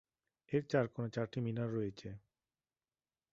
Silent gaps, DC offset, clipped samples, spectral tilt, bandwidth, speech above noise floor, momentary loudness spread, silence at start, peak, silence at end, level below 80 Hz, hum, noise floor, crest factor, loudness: none; under 0.1%; under 0.1%; -7 dB/octave; 7.6 kHz; over 52 dB; 16 LU; 0.5 s; -18 dBFS; 1.15 s; -72 dBFS; none; under -90 dBFS; 22 dB; -39 LUFS